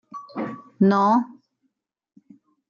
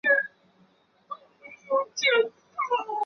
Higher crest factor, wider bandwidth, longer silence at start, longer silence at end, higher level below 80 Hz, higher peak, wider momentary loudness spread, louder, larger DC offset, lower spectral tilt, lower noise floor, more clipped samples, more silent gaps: about the same, 18 dB vs 18 dB; about the same, 7 kHz vs 6.8 kHz; about the same, 0.15 s vs 0.05 s; first, 1.35 s vs 0 s; first, -72 dBFS vs -82 dBFS; about the same, -8 dBFS vs -10 dBFS; about the same, 18 LU vs 20 LU; first, -21 LUFS vs -26 LUFS; neither; first, -8.5 dB/octave vs -0.5 dB/octave; first, -74 dBFS vs -63 dBFS; neither; neither